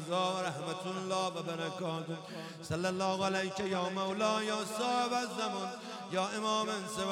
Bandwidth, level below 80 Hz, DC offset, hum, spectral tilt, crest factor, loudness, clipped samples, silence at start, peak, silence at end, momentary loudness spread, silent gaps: 16 kHz; -72 dBFS; under 0.1%; none; -4 dB/octave; 18 dB; -35 LUFS; under 0.1%; 0 s; -18 dBFS; 0 s; 8 LU; none